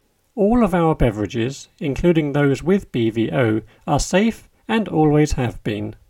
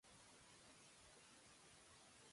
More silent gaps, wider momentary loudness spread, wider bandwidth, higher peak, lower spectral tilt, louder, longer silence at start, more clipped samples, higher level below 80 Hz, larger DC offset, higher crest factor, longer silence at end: neither; first, 10 LU vs 0 LU; first, 16 kHz vs 11.5 kHz; first, -2 dBFS vs -54 dBFS; first, -6.5 dB/octave vs -2 dB/octave; first, -19 LUFS vs -65 LUFS; first, 0.35 s vs 0.05 s; neither; first, -34 dBFS vs -84 dBFS; neither; about the same, 16 dB vs 12 dB; first, 0.15 s vs 0 s